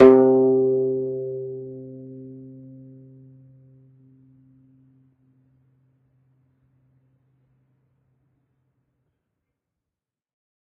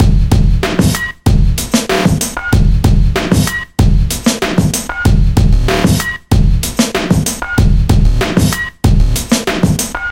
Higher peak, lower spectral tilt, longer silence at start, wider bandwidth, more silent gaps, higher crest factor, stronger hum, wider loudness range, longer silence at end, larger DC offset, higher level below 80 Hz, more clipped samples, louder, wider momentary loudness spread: about the same, 0 dBFS vs 0 dBFS; first, -8 dB/octave vs -5 dB/octave; about the same, 0 s vs 0 s; second, 3.7 kHz vs 16.5 kHz; neither; first, 24 dB vs 10 dB; neither; first, 28 LU vs 0 LU; first, 8.4 s vs 0 s; second, under 0.1% vs 0.4%; second, -64 dBFS vs -14 dBFS; neither; second, -20 LUFS vs -13 LUFS; first, 28 LU vs 3 LU